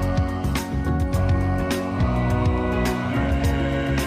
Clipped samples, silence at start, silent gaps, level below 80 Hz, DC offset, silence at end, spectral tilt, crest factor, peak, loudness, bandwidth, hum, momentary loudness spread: under 0.1%; 0 s; none; -28 dBFS; under 0.1%; 0 s; -6.5 dB/octave; 10 dB; -12 dBFS; -23 LUFS; 15.5 kHz; none; 3 LU